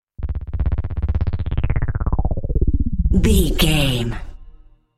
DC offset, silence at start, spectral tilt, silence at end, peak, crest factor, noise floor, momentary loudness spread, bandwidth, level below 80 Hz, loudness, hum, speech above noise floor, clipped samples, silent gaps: under 0.1%; 0.2 s; -5.5 dB/octave; 0.45 s; -4 dBFS; 16 dB; -44 dBFS; 11 LU; 16 kHz; -22 dBFS; -21 LUFS; none; 28 dB; under 0.1%; none